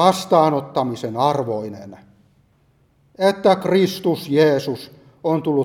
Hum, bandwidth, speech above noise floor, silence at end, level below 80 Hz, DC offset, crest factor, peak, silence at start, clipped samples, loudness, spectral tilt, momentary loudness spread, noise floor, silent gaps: none; 17 kHz; 41 dB; 0 s; -64 dBFS; under 0.1%; 18 dB; 0 dBFS; 0 s; under 0.1%; -19 LUFS; -6 dB/octave; 12 LU; -59 dBFS; none